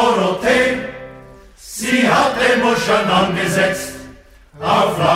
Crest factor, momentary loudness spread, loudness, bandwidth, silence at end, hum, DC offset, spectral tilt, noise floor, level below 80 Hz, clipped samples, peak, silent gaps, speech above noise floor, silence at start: 16 dB; 16 LU; -15 LUFS; 16 kHz; 0 s; none; under 0.1%; -4 dB/octave; -42 dBFS; -46 dBFS; under 0.1%; -2 dBFS; none; 26 dB; 0 s